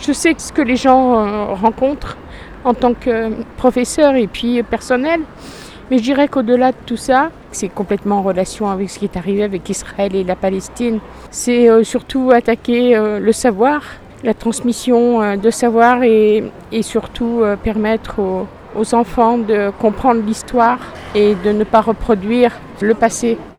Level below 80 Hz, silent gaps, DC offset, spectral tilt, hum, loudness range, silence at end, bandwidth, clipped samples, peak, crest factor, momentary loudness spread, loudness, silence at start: -38 dBFS; none; under 0.1%; -5 dB/octave; none; 4 LU; 0.05 s; 13.5 kHz; under 0.1%; 0 dBFS; 14 dB; 10 LU; -15 LUFS; 0 s